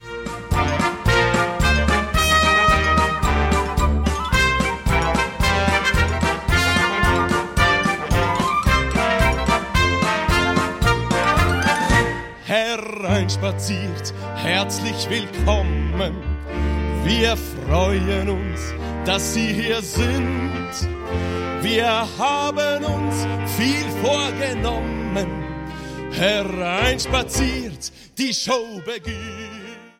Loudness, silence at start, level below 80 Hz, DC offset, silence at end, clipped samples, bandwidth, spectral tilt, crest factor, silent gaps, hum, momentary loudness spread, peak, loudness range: -20 LUFS; 0 s; -28 dBFS; under 0.1%; 0.1 s; under 0.1%; 16.5 kHz; -4.5 dB/octave; 16 dB; none; none; 10 LU; -4 dBFS; 5 LU